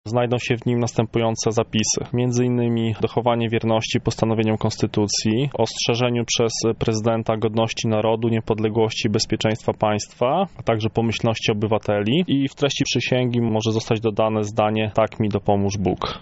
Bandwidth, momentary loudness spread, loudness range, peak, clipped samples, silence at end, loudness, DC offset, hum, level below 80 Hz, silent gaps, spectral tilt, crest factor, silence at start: 8 kHz; 2 LU; 1 LU; -4 dBFS; under 0.1%; 0 s; -21 LUFS; under 0.1%; none; -48 dBFS; none; -5 dB/octave; 18 dB; 0.05 s